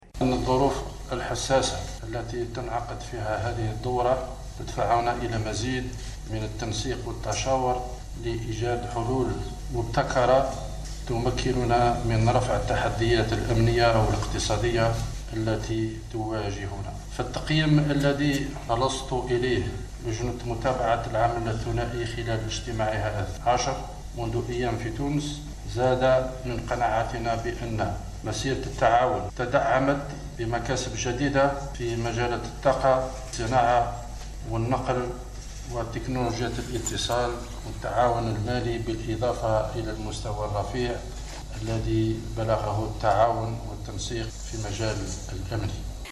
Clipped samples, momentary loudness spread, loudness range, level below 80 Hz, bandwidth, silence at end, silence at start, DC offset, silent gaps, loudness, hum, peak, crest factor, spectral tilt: under 0.1%; 11 LU; 5 LU; -36 dBFS; 13 kHz; 0 s; 0.05 s; under 0.1%; none; -27 LUFS; none; -10 dBFS; 18 dB; -5.5 dB/octave